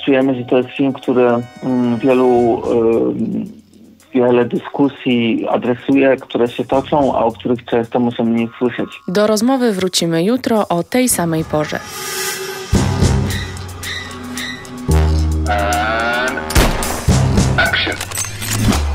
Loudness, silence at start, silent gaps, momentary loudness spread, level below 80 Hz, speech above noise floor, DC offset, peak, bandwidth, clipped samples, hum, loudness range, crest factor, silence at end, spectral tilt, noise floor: -16 LUFS; 0 s; none; 9 LU; -26 dBFS; 29 dB; under 0.1%; -2 dBFS; 16.5 kHz; under 0.1%; none; 3 LU; 14 dB; 0 s; -5 dB/octave; -44 dBFS